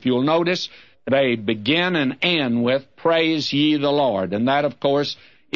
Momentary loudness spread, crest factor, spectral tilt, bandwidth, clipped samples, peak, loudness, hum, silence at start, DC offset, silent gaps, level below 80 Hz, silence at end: 4 LU; 14 dB; -6 dB/octave; 7.2 kHz; under 0.1%; -6 dBFS; -20 LUFS; none; 0 s; 0.2%; none; -64 dBFS; 0.4 s